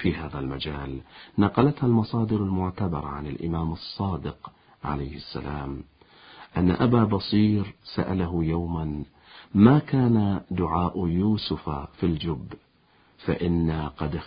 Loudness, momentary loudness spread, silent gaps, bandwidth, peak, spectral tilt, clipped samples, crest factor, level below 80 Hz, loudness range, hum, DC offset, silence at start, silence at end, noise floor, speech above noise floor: -25 LUFS; 14 LU; none; 5.2 kHz; -2 dBFS; -12 dB/octave; under 0.1%; 22 dB; -40 dBFS; 8 LU; none; under 0.1%; 0 s; 0 s; -61 dBFS; 36 dB